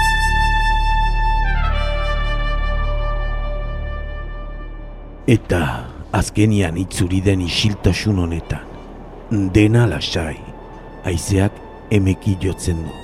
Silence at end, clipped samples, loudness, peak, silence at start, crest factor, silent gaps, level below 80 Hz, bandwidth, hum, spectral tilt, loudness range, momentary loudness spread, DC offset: 0 s; under 0.1%; -19 LUFS; -2 dBFS; 0 s; 18 dB; none; -24 dBFS; 14 kHz; none; -5.5 dB/octave; 5 LU; 17 LU; under 0.1%